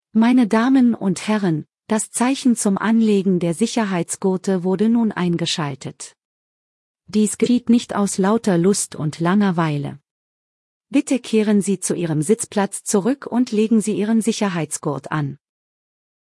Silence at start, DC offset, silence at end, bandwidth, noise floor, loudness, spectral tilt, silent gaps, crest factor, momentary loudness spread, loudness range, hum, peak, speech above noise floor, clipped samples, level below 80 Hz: 0.15 s; under 0.1%; 0.85 s; 12 kHz; under -90 dBFS; -19 LUFS; -5.5 dB/octave; 6.25-6.94 s, 10.11-10.80 s; 16 dB; 8 LU; 3 LU; none; -4 dBFS; over 72 dB; under 0.1%; -64 dBFS